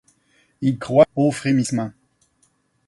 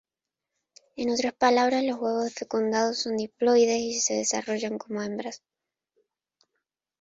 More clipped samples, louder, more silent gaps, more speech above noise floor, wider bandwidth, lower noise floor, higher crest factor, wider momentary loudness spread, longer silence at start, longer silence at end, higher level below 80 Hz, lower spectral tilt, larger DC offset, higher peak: neither; first, -20 LUFS vs -26 LUFS; neither; second, 46 dB vs 63 dB; first, 11.5 kHz vs 8 kHz; second, -64 dBFS vs -88 dBFS; about the same, 20 dB vs 20 dB; about the same, 9 LU vs 11 LU; second, 0.6 s vs 0.95 s; second, 0.95 s vs 1.65 s; first, -58 dBFS vs -70 dBFS; first, -6.5 dB/octave vs -2.5 dB/octave; neither; first, -2 dBFS vs -8 dBFS